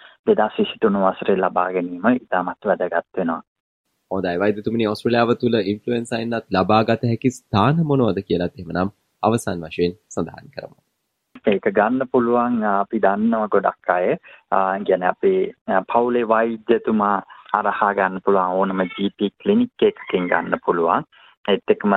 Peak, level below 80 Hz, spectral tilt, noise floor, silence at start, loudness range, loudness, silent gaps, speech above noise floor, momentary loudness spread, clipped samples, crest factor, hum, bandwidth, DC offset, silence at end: -2 dBFS; -58 dBFS; -7 dB/octave; -74 dBFS; 0.25 s; 3 LU; -20 LUFS; 3.47-3.84 s, 15.61-15.66 s, 21.37-21.44 s; 54 dB; 7 LU; under 0.1%; 18 dB; none; 12 kHz; under 0.1%; 0 s